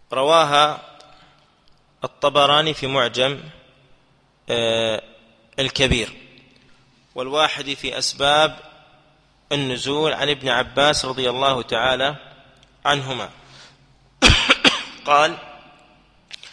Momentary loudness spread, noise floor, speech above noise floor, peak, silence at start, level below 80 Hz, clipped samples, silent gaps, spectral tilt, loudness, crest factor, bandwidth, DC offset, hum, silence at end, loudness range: 16 LU; -58 dBFS; 39 dB; 0 dBFS; 0.1 s; -40 dBFS; under 0.1%; none; -3 dB/octave; -19 LUFS; 22 dB; 11 kHz; under 0.1%; none; 0.05 s; 5 LU